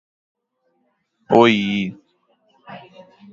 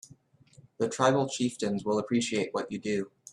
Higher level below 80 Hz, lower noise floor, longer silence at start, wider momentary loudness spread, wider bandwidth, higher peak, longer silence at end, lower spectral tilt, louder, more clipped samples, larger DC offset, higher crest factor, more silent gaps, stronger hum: first, -62 dBFS vs -68 dBFS; first, -69 dBFS vs -59 dBFS; first, 1.3 s vs 0.8 s; first, 27 LU vs 8 LU; second, 7.6 kHz vs 12 kHz; first, 0 dBFS vs -10 dBFS; first, 0.55 s vs 0.25 s; about the same, -6 dB/octave vs -5 dB/octave; first, -17 LUFS vs -29 LUFS; neither; neither; about the same, 22 dB vs 22 dB; neither; neither